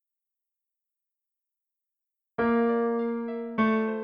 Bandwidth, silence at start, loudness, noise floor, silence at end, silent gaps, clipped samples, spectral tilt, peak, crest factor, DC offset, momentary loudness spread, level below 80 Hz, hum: 5.2 kHz; 2.4 s; -27 LUFS; -87 dBFS; 0 s; none; under 0.1%; -9 dB/octave; -12 dBFS; 18 dB; under 0.1%; 8 LU; -66 dBFS; none